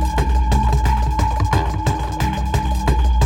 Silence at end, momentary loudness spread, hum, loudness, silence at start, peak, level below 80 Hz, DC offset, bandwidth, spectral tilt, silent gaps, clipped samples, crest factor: 0 s; 4 LU; none; -19 LUFS; 0 s; -4 dBFS; -18 dBFS; under 0.1%; 15.5 kHz; -6 dB/octave; none; under 0.1%; 12 dB